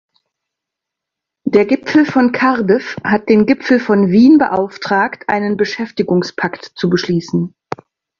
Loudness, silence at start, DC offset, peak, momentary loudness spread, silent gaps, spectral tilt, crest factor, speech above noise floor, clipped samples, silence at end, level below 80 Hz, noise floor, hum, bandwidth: -14 LUFS; 1.45 s; under 0.1%; 0 dBFS; 11 LU; none; -7 dB/octave; 14 dB; 68 dB; under 0.1%; 0.7 s; -54 dBFS; -81 dBFS; none; 7.2 kHz